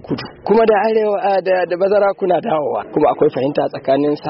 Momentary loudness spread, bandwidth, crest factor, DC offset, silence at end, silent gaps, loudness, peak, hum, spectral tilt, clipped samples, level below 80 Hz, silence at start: 6 LU; 5.8 kHz; 12 dB; under 0.1%; 0 s; none; -16 LUFS; -4 dBFS; none; -5 dB/octave; under 0.1%; -54 dBFS; 0.05 s